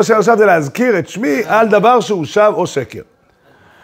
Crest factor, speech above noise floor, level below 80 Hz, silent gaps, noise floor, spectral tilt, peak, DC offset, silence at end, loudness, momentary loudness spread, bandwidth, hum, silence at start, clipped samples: 12 dB; 37 dB; -60 dBFS; none; -50 dBFS; -5.5 dB/octave; 0 dBFS; under 0.1%; 0.8 s; -12 LUFS; 10 LU; 16 kHz; none; 0 s; under 0.1%